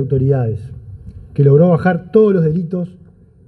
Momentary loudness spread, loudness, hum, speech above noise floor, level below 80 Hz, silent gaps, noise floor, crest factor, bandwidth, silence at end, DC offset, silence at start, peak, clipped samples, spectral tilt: 19 LU; -14 LUFS; none; 20 dB; -42 dBFS; none; -34 dBFS; 14 dB; 4.5 kHz; 0.55 s; under 0.1%; 0 s; 0 dBFS; under 0.1%; -11.5 dB/octave